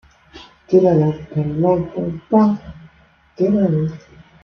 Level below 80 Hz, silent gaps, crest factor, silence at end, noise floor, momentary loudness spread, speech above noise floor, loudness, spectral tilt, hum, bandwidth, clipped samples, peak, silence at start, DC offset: -48 dBFS; none; 16 dB; 0.45 s; -52 dBFS; 11 LU; 36 dB; -18 LUFS; -10 dB/octave; none; 6.4 kHz; under 0.1%; -2 dBFS; 0.35 s; under 0.1%